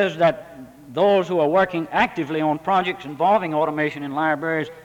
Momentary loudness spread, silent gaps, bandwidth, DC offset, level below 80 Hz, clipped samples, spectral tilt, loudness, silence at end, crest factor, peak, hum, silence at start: 6 LU; none; 18.5 kHz; under 0.1%; -58 dBFS; under 0.1%; -6.5 dB/octave; -21 LUFS; 0 s; 16 dB; -4 dBFS; none; 0 s